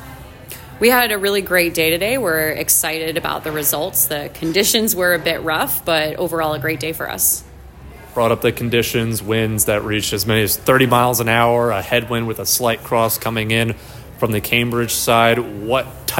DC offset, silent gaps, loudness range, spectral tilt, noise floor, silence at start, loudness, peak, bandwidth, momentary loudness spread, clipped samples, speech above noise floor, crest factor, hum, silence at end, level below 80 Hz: under 0.1%; none; 3 LU; -3.5 dB/octave; -38 dBFS; 0 s; -17 LUFS; 0 dBFS; 17 kHz; 8 LU; under 0.1%; 20 dB; 18 dB; none; 0 s; -42 dBFS